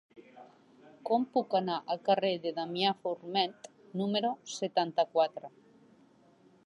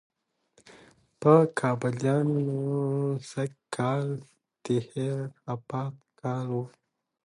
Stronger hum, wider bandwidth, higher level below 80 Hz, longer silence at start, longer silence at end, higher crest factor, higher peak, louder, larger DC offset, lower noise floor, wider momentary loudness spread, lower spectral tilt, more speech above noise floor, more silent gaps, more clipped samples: neither; about the same, 11 kHz vs 11.5 kHz; second, -86 dBFS vs -72 dBFS; second, 0.15 s vs 1.2 s; first, 1.2 s vs 0.6 s; about the same, 20 dB vs 22 dB; second, -14 dBFS vs -6 dBFS; second, -32 LUFS vs -28 LUFS; neither; second, -63 dBFS vs -67 dBFS; second, 9 LU vs 15 LU; second, -5 dB/octave vs -7.5 dB/octave; second, 31 dB vs 40 dB; neither; neither